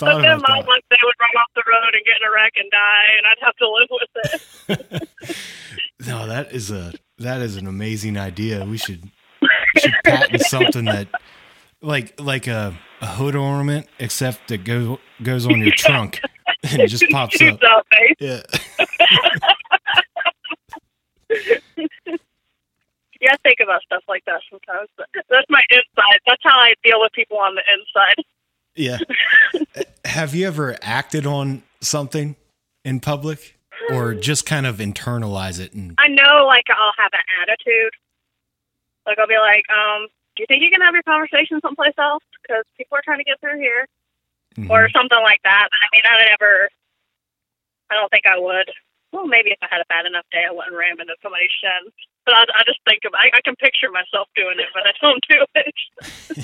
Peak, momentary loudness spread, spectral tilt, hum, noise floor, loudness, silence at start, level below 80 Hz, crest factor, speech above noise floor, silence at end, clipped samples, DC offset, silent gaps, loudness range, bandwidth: 0 dBFS; 17 LU; -3.5 dB/octave; none; -82 dBFS; -14 LUFS; 0 s; -58 dBFS; 16 dB; 66 dB; 0 s; under 0.1%; under 0.1%; none; 11 LU; 16.5 kHz